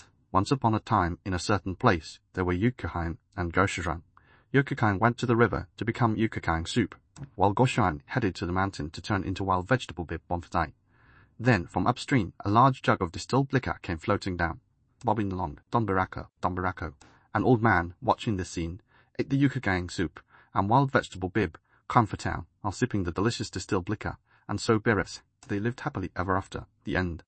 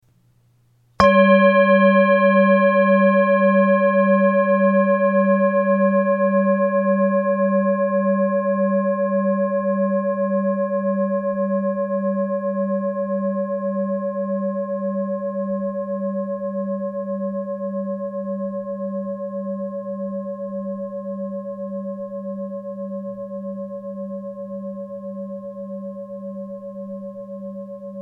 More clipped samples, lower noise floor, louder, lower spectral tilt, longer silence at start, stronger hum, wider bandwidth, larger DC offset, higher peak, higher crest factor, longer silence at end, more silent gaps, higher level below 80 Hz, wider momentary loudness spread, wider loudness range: neither; about the same, -59 dBFS vs -58 dBFS; second, -28 LUFS vs -20 LUFS; second, -6.5 dB/octave vs -9 dB/octave; second, 0.35 s vs 1 s; neither; first, 8.8 kHz vs 5.8 kHz; neither; second, -6 dBFS vs 0 dBFS; about the same, 22 dB vs 20 dB; about the same, 0.05 s vs 0 s; neither; first, -50 dBFS vs -58 dBFS; second, 11 LU vs 17 LU; second, 4 LU vs 16 LU